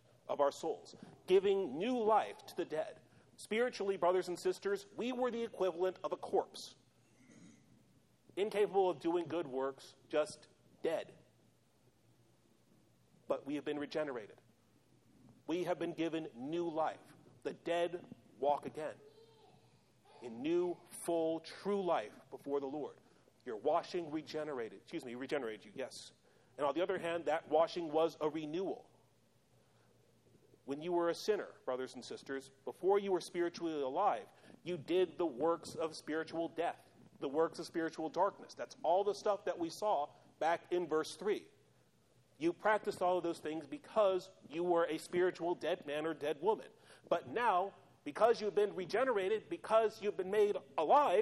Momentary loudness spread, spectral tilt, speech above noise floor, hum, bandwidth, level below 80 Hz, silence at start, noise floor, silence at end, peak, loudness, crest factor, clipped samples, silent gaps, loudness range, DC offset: 14 LU; -5 dB/octave; 35 dB; none; 13 kHz; -84 dBFS; 0.3 s; -72 dBFS; 0 s; -18 dBFS; -37 LUFS; 20 dB; under 0.1%; none; 6 LU; under 0.1%